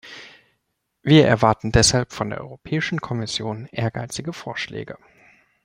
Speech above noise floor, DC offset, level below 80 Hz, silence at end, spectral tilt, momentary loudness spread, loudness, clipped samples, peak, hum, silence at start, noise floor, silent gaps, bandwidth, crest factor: 54 dB; under 0.1%; -40 dBFS; 0.7 s; -4.5 dB/octave; 19 LU; -21 LUFS; under 0.1%; -2 dBFS; none; 0.05 s; -74 dBFS; none; 16 kHz; 20 dB